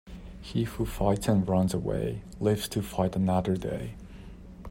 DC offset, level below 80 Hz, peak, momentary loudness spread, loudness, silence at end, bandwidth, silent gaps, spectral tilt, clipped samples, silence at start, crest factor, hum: under 0.1%; -44 dBFS; -10 dBFS; 21 LU; -29 LUFS; 0 s; 16 kHz; none; -7 dB/octave; under 0.1%; 0.05 s; 18 dB; none